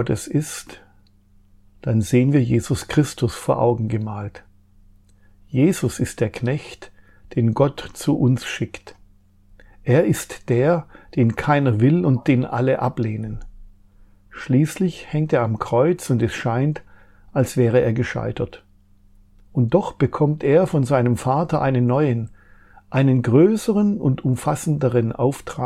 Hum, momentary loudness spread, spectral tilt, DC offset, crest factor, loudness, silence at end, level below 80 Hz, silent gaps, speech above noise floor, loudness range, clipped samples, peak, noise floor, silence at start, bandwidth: none; 11 LU; -7 dB/octave; under 0.1%; 18 dB; -20 LUFS; 0 s; -48 dBFS; none; 34 dB; 4 LU; under 0.1%; -4 dBFS; -53 dBFS; 0 s; 14.5 kHz